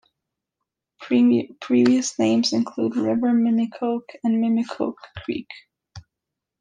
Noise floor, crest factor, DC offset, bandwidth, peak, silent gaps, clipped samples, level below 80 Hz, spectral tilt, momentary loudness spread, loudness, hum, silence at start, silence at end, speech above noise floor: -84 dBFS; 14 dB; under 0.1%; 9.4 kHz; -8 dBFS; none; under 0.1%; -64 dBFS; -5 dB/octave; 13 LU; -21 LUFS; none; 1 s; 0.6 s; 64 dB